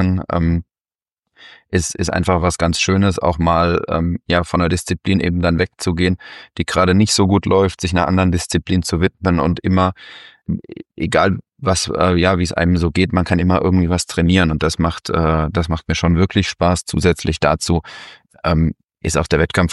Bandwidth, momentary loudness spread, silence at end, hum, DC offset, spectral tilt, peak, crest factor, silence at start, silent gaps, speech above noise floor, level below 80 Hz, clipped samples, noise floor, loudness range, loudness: 12 kHz; 7 LU; 0 s; none; under 0.1%; -5.5 dB/octave; -2 dBFS; 16 dB; 0 s; 1.19-1.23 s; over 74 dB; -32 dBFS; under 0.1%; under -90 dBFS; 3 LU; -17 LUFS